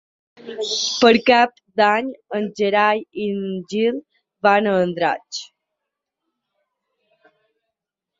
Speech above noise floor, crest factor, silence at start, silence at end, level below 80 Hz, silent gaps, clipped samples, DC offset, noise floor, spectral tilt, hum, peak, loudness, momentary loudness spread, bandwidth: 64 dB; 20 dB; 0.45 s; 2.75 s; -66 dBFS; none; under 0.1%; under 0.1%; -83 dBFS; -4 dB/octave; none; -2 dBFS; -19 LUFS; 13 LU; 7.8 kHz